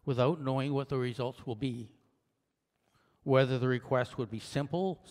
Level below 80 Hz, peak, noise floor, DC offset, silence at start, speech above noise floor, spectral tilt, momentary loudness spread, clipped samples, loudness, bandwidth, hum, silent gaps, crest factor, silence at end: -66 dBFS; -14 dBFS; -82 dBFS; under 0.1%; 0.05 s; 50 dB; -7.5 dB/octave; 10 LU; under 0.1%; -32 LUFS; 11 kHz; none; none; 20 dB; 0 s